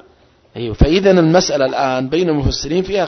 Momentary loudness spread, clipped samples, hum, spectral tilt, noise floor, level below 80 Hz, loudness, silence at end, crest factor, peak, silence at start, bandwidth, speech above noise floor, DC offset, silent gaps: 12 LU; under 0.1%; none; -5.5 dB/octave; -50 dBFS; -26 dBFS; -14 LUFS; 0 s; 14 dB; 0 dBFS; 0.55 s; 6.4 kHz; 36 dB; under 0.1%; none